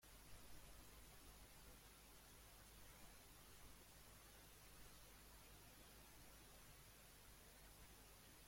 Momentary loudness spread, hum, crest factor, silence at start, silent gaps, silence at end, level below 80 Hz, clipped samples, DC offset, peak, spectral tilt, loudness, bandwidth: 1 LU; 50 Hz at -70 dBFS; 16 dB; 0 s; none; 0 s; -70 dBFS; under 0.1%; under 0.1%; -48 dBFS; -2.5 dB/octave; -64 LUFS; 16.5 kHz